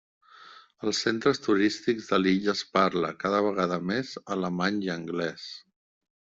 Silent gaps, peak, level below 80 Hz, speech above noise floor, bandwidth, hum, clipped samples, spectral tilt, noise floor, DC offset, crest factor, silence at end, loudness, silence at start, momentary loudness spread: none; -8 dBFS; -66 dBFS; 25 dB; 7.8 kHz; none; under 0.1%; -5 dB/octave; -52 dBFS; under 0.1%; 20 dB; 0.8 s; -27 LUFS; 0.4 s; 9 LU